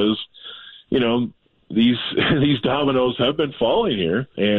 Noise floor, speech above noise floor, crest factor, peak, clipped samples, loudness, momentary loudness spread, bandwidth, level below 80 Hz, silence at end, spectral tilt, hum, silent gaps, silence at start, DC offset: -40 dBFS; 21 dB; 12 dB; -8 dBFS; under 0.1%; -20 LUFS; 11 LU; 4.3 kHz; -50 dBFS; 0 s; -9 dB/octave; none; none; 0 s; under 0.1%